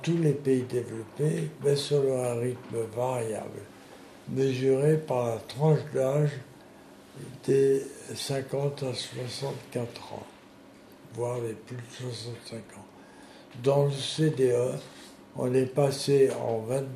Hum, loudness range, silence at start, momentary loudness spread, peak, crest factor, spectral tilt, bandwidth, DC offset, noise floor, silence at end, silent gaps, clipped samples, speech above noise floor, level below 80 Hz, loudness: none; 9 LU; 0 s; 19 LU; -12 dBFS; 18 dB; -6 dB/octave; 13.5 kHz; under 0.1%; -52 dBFS; 0 s; none; under 0.1%; 24 dB; -68 dBFS; -28 LUFS